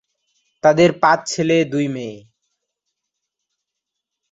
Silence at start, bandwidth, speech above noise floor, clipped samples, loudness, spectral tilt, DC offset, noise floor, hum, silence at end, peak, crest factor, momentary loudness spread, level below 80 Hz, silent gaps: 0.65 s; 8 kHz; 65 dB; under 0.1%; -16 LUFS; -5 dB/octave; under 0.1%; -81 dBFS; none; 2.15 s; -2 dBFS; 20 dB; 12 LU; -60 dBFS; none